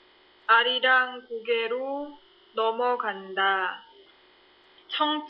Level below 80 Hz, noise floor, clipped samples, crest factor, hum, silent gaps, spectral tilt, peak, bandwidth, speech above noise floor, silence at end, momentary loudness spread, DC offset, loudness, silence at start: -78 dBFS; -58 dBFS; under 0.1%; 22 dB; none; none; -5.5 dB/octave; -6 dBFS; 5.6 kHz; 32 dB; 0 s; 15 LU; under 0.1%; -25 LUFS; 0.5 s